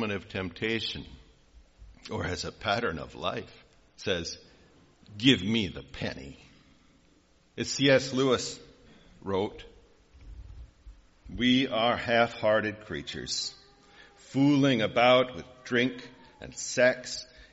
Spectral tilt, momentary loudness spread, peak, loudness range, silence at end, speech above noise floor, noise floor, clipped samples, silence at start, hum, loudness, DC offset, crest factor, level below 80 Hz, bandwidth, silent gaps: -3 dB/octave; 21 LU; -8 dBFS; 7 LU; 0.1 s; 35 dB; -63 dBFS; under 0.1%; 0 s; none; -28 LUFS; under 0.1%; 22 dB; -56 dBFS; 8 kHz; none